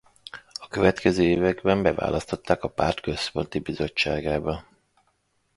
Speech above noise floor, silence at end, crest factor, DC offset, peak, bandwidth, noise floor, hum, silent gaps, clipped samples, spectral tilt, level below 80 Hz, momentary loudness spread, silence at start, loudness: 46 dB; 0.95 s; 22 dB; under 0.1%; -4 dBFS; 11.5 kHz; -70 dBFS; none; none; under 0.1%; -6 dB/octave; -44 dBFS; 14 LU; 0.35 s; -25 LUFS